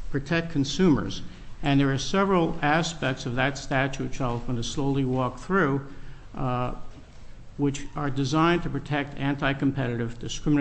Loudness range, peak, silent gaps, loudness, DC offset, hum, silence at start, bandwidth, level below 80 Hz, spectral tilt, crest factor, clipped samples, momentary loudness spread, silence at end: 4 LU; -10 dBFS; none; -26 LUFS; under 0.1%; none; 0 s; 8.6 kHz; -40 dBFS; -6 dB/octave; 16 dB; under 0.1%; 10 LU; 0 s